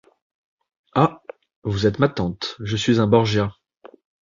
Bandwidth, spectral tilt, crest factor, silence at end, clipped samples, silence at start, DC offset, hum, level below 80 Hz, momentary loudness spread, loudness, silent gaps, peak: 7.4 kHz; -6.5 dB/octave; 20 dB; 0.35 s; under 0.1%; 0.95 s; under 0.1%; none; -48 dBFS; 12 LU; -21 LUFS; 1.56-1.62 s; -2 dBFS